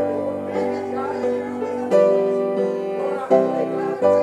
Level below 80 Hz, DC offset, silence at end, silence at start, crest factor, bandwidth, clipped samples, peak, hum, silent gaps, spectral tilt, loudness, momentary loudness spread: -70 dBFS; under 0.1%; 0 s; 0 s; 16 dB; 10.5 kHz; under 0.1%; -4 dBFS; none; none; -7 dB/octave; -21 LUFS; 8 LU